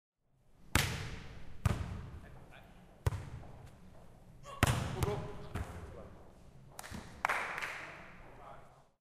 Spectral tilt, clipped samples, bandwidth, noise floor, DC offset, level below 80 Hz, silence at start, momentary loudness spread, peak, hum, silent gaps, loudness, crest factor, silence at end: -4.5 dB/octave; under 0.1%; 15.5 kHz; -66 dBFS; under 0.1%; -50 dBFS; 0.5 s; 24 LU; -6 dBFS; none; none; -38 LUFS; 34 dB; 0.2 s